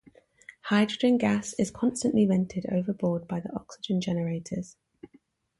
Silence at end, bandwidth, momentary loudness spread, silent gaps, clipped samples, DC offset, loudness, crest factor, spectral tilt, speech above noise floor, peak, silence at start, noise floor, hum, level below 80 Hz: 0.9 s; 11.5 kHz; 13 LU; none; under 0.1%; under 0.1%; -28 LUFS; 18 dB; -6 dB/octave; 36 dB; -12 dBFS; 0.65 s; -63 dBFS; none; -62 dBFS